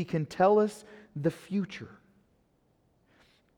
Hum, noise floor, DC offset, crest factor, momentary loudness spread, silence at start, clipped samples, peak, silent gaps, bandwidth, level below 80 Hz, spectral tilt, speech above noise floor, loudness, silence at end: none; -70 dBFS; under 0.1%; 20 dB; 21 LU; 0 s; under 0.1%; -12 dBFS; none; 13 kHz; -70 dBFS; -7 dB/octave; 41 dB; -29 LUFS; 1.7 s